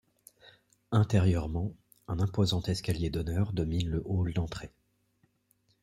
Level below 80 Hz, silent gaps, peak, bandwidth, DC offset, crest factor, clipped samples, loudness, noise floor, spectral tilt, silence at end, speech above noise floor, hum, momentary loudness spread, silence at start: -48 dBFS; none; -12 dBFS; 13.5 kHz; under 0.1%; 20 dB; under 0.1%; -31 LUFS; -72 dBFS; -7 dB/octave; 1.15 s; 43 dB; none; 12 LU; 0.45 s